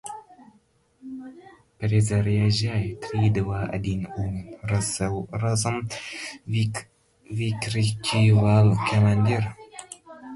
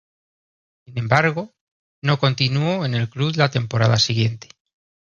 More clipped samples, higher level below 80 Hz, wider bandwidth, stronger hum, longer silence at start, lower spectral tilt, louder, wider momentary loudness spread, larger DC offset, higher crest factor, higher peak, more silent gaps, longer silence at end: neither; first, -46 dBFS vs -54 dBFS; first, 11.5 kHz vs 7.2 kHz; neither; second, 0.05 s vs 0.9 s; about the same, -6 dB/octave vs -5.5 dB/octave; second, -24 LUFS vs -20 LUFS; first, 20 LU vs 12 LU; neither; about the same, 18 dB vs 20 dB; second, -6 dBFS vs -2 dBFS; second, none vs 1.61-2.02 s; second, 0 s vs 0.7 s